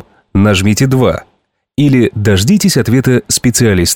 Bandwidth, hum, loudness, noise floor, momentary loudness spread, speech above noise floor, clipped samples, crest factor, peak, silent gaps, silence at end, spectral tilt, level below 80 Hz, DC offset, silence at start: 18 kHz; none; -11 LUFS; -58 dBFS; 5 LU; 48 dB; under 0.1%; 10 dB; 0 dBFS; none; 0 s; -5 dB/octave; -36 dBFS; under 0.1%; 0.35 s